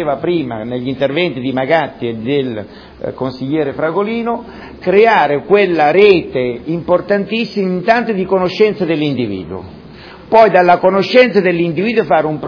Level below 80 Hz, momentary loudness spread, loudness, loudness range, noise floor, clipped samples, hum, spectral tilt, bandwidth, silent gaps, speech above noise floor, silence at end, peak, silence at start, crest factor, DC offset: -48 dBFS; 13 LU; -13 LUFS; 5 LU; -35 dBFS; 0.1%; none; -7.5 dB/octave; 5.4 kHz; none; 22 dB; 0 s; 0 dBFS; 0 s; 14 dB; under 0.1%